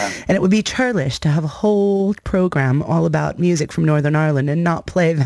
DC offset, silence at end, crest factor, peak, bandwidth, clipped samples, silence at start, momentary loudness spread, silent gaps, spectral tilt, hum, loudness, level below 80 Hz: under 0.1%; 0 s; 12 dB; -6 dBFS; 11 kHz; under 0.1%; 0 s; 3 LU; none; -6.5 dB/octave; none; -18 LUFS; -42 dBFS